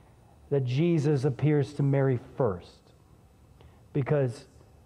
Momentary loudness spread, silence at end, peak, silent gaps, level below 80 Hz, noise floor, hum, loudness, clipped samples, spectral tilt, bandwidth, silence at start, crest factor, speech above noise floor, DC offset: 8 LU; 0.45 s; -12 dBFS; none; -60 dBFS; -57 dBFS; none; -28 LUFS; under 0.1%; -8.5 dB/octave; 9.8 kHz; 0.5 s; 16 dB; 31 dB; under 0.1%